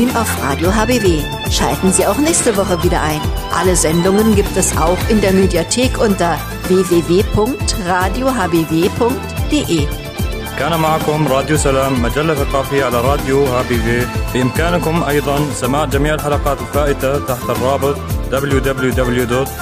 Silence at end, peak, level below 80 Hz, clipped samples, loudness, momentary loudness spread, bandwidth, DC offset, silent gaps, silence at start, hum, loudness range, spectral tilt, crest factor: 0 s; -2 dBFS; -24 dBFS; under 0.1%; -15 LUFS; 5 LU; 15.5 kHz; under 0.1%; none; 0 s; none; 3 LU; -5 dB/octave; 14 dB